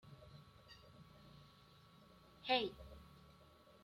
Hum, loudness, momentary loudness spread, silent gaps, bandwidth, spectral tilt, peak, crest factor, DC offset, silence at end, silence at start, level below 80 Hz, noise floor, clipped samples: none; -40 LUFS; 27 LU; none; 16 kHz; -5 dB/octave; -22 dBFS; 26 dB; under 0.1%; 0.4 s; 0.05 s; -70 dBFS; -66 dBFS; under 0.1%